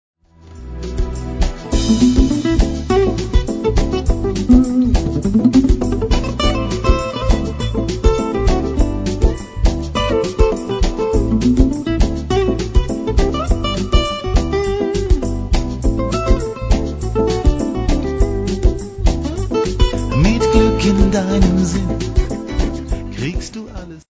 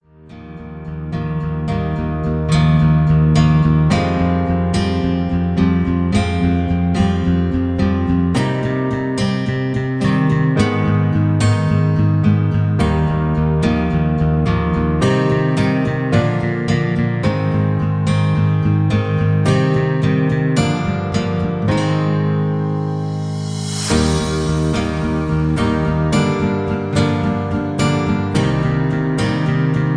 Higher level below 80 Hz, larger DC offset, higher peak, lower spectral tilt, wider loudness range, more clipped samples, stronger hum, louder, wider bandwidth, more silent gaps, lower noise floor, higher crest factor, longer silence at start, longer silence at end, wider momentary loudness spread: first, -20 dBFS vs -30 dBFS; neither; about the same, 0 dBFS vs 0 dBFS; about the same, -6.5 dB/octave vs -7 dB/octave; about the same, 3 LU vs 3 LU; neither; neither; about the same, -17 LUFS vs -17 LUFS; second, 8 kHz vs 10.5 kHz; neither; about the same, -38 dBFS vs -38 dBFS; about the same, 14 dB vs 16 dB; first, 0.5 s vs 0.25 s; about the same, 0.1 s vs 0 s; first, 9 LU vs 5 LU